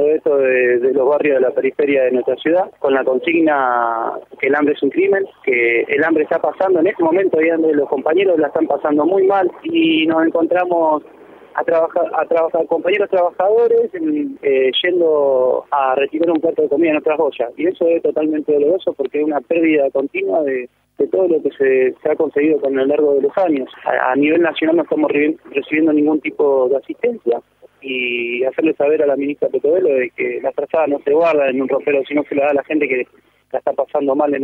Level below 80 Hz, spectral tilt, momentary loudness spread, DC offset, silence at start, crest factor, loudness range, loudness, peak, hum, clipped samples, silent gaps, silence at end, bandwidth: -66 dBFS; -7.5 dB/octave; 6 LU; under 0.1%; 0 s; 16 dB; 2 LU; -16 LUFS; 0 dBFS; none; under 0.1%; none; 0 s; 4.2 kHz